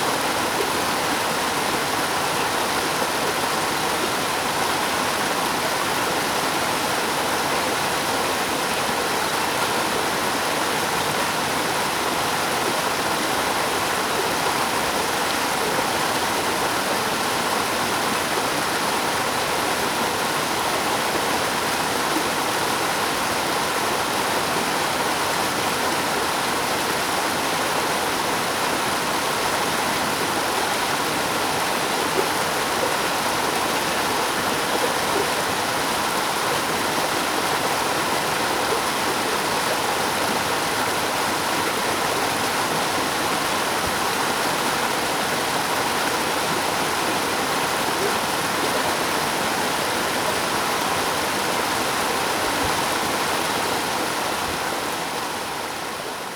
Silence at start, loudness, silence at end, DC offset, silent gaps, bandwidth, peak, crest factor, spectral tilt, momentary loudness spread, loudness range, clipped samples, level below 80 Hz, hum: 0 s; -21 LUFS; 0 s; under 0.1%; none; over 20 kHz; -8 dBFS; 16 dB; -2 dB/octave; 1 LU; 0 LU; under 0.1%; -52 dBFS; none